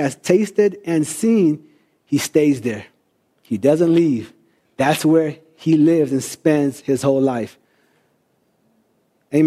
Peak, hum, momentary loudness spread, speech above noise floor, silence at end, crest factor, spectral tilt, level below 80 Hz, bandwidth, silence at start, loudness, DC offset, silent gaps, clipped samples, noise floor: -2 dBFS; none; 11 LU; 47 dB; 0 s; 16 dB; -6 dB/octave; -64 dBFS; 15 kHz; 0 s; -18 LUFS; under 0.1%; none; under 0.1%; -64 dBFS